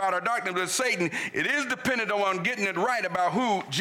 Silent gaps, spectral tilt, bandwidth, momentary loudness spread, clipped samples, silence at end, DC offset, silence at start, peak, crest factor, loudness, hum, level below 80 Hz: none; -3 dB/octave; 18.5 kHz; 2 LU; under 0.1%; 0 s; under 0.1%; 0 s; -16 dBFS; 10 dB; -26 LUFS; none; -70 dBFS